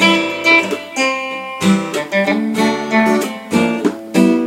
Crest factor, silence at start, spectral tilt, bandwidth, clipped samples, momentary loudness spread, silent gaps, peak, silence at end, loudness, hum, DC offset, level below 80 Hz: 16 dB; 0 s; -4.5 dB/octave; 16.5 kHz; under 0.1%; 7 LU; none; 0 dBFS; 0 s; -15 LUFS; none; under 0.1%; -60 dBFS